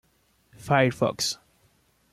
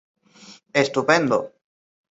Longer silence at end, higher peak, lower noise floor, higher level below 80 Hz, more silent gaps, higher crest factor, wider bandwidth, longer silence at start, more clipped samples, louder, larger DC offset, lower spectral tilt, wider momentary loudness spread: about the same, 0.8 s vs 0.7 s; second, -8 dBFS vs -2 dBFS; first, -66 dBFS vs -48 dBFS; about the same, -62 dBFS vs -66 dBFS; neither; about the same, 20 dB vs 22 dB; first, 15.5 kHz vs 8 kHz; about the same, 0.6 s vs 0.5 s; neither; second, -24 LUFS vs -20 LUFS; neither; about the same, -4.5 dB/octave vs -4.5 dB/octave; first, 16 LU vs 7 LU